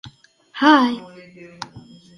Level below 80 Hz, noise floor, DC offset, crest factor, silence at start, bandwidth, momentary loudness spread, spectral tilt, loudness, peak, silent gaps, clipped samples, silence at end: -62 dBFS; -47 dBFS; under 0.1%; 20 dB; 0.05 s; 11.5 kHz; 22 LU; -4.5 dB/octave; -16 LUFS; -2 dBFS; none; under 0.1%; 0.4 s